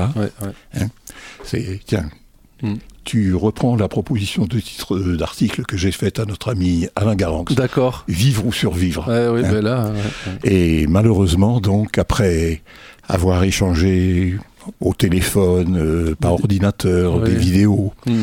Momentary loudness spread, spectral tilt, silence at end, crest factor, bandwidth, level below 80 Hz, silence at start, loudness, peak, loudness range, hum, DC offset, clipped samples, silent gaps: 10 LU; -6.5 dB/octave; 0 s; 16 dB; 16.5 kHz; -32 dBFS; 0 s; -18 LUFS; -2 dBFS; 4 LU; none; under 0.1%; under 0.1%; none